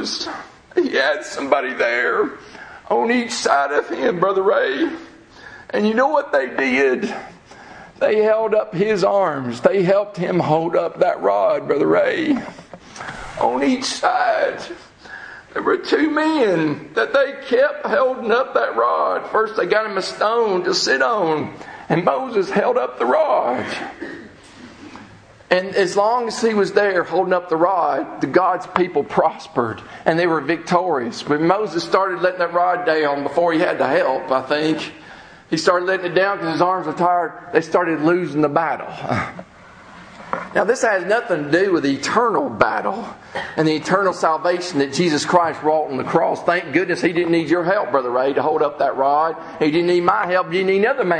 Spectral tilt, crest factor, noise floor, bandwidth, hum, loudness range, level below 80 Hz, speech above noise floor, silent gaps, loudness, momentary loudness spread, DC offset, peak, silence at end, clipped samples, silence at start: -5 dB/octave; 18 dB; -44 dBFS; 10 kHz; none; 3 LU; -58 dBFS; 25 dB; none; -19 LUFS; 9 LU; under 0.1%; 0 dBFS; 0 s; under 0.1%; 0 s